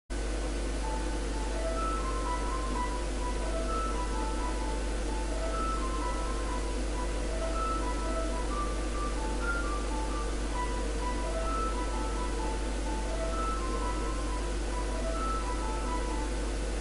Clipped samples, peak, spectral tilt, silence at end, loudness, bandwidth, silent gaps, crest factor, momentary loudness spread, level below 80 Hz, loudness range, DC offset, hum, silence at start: under 0.1%; -20 dBFS; -5 dB/octave; 0 s; -34 LUFS; 11.5 kHz; none; 12 dB; 2 LU; -34 dBFS; 1 LU; 0.2%; none; 0.1 s